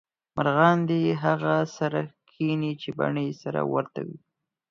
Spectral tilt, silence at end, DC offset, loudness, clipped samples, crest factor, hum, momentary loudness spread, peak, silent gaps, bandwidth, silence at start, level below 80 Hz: -7.5 dB/octave; 0.55 s; under 0.1%; -26 LUFS; under 0.1%; 22 dB; none; 14 LU; -4 dBFS; none; 7.2 kHz; 0.35 s; -68 dBFS